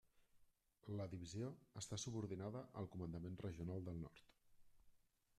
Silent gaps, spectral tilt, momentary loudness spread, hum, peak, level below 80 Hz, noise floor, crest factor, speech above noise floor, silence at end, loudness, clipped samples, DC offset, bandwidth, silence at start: none; -5.5 dB/octave; 6 LU; none; -36 dBFS; -72 dBFS; -75 dBFS; 16 dB; 25 dB; 0.4 s; -51 LUFS; under 0.1%; under 0.1%; 13.5 kHz; 0.15 s